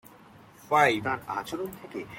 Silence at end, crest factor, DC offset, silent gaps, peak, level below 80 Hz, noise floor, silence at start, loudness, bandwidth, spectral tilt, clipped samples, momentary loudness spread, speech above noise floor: 0 s; 22 dB; under 0.1%; none; -8 dBFS; -64 dBFS; -53 dBFS; 0.65 s; -27 LUFS; 17 kHz; -4.5 dB/octave; under 0.1%; 14 LU; 25 dB